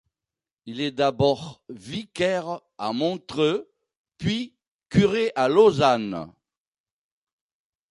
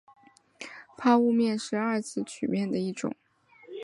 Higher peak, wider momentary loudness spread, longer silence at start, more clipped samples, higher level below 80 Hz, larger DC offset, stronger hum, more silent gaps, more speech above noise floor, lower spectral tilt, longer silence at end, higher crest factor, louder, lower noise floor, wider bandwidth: first, -4 dBFS vs -10 dBFS; second, 17 LU vs 21 LU; about the same, 0.65 s vs 0.6 s; neither; first, -54 dBFS vs -74 dBFS; neither; neither; first, 3.97-4.04 s, 4.68-4.79 s vs none; first, over 67 dB vs 24 dB; about the same, -6 dB/octave vs -5.5 dB/octave; first, 1.65 s vs 0 s; about the same, 20 dB vs 18 dB; first, -23 LUFS vs -28 LUFS; first, under -90 dBFS vs -51 dBFS; about the same, 11 kHz vs 11.5 kHz